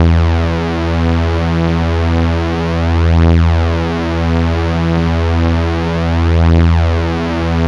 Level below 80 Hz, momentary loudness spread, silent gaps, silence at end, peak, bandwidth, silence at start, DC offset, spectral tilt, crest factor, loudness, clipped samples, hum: -24 dBFS; 5 LU; none; 0 s; -2 dBFS; 7 kHz; 0 s; 0.9%; -8 dB/octave; 10 dB; -14 LUFS; under 0.1%; none